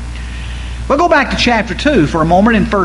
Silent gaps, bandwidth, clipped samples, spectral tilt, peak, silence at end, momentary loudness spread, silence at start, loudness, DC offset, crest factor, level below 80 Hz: none; 11.5 kHz; under 0.1%; -5.5 dB/octave; 0 dBFS; 0 s; 15 LU; 0 s; -11 LUFS; under 0.1%; 12 dB; -24 dBFS